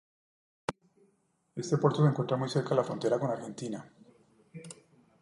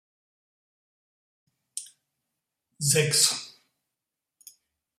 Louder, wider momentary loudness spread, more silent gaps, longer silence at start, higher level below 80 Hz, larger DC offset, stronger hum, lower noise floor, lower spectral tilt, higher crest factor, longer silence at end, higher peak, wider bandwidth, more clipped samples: second, -31 LUFS vs -23 LUFS; about the same, 21 LU vs 19 LU; neither; second, 0.7 s vs 1.75 s; about the same, -74 dBFS vs -72 dBFS; neither; neither; second, -73 dBFS vs -87 dBFS; first, -7 dB/octave vs -2 dB/octave; second, 20 dB vs 26 dB; second, 0.5 s vs 1.5 s; second, -12 dBFS vs -8 dBFS; second, 11.5 kHz vs 16 kHz; neither